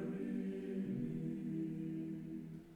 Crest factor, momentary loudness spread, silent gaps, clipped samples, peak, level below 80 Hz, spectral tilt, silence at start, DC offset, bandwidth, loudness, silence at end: 12 dB; 5 LU; none; under 0.1%; -30 dBFS; -70 dBFS; -9.5 dB/octave; 0 s; under 0.1%; 11 kHz; -43 LUFS; 0 s